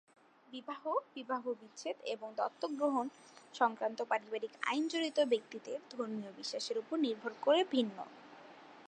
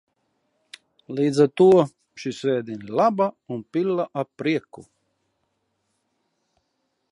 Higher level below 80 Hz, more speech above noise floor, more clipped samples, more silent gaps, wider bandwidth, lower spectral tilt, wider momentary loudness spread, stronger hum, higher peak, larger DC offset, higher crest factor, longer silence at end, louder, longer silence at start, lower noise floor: second, under -90 dBFS vs -70 dBFS; second, 19 dB vs 53 dB; neither; neither; second, 9.8 kHz vs 11 kHz; second, -3.5 dB/octave vs -7 dB/octave; about the same, 16 LU vs 14 LU; neither; second, -18 dBFS vs -4 dBFS; neither; about the same, 20 dB vs 20 dB; second, 0 s vs 2.3 s; second, -37 LUFS vs -22 LUFS; second, 0.5 s vs 1.1 s; second, -56 dBFS vs -74 dBFS